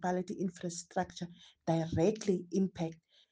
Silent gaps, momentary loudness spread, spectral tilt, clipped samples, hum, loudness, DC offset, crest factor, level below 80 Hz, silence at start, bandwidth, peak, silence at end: none; 11 LU; -6.5 dB/octave; under 0.1%; none; -35 LUFS; under 0.1%; 18 dB; -64 dBFS; 0 s; 9.6 kHz; -18 dBFS; 0.35 s